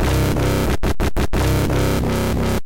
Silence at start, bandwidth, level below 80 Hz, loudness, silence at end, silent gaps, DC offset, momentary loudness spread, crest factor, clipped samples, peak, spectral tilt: 0 s; 17 kHz; -24 dBFS; -19 LUFS; 0 s; none; under 0.1%; 3 LU; 8 dB; under 0.1%; -10 dBFS; -6 dB/octave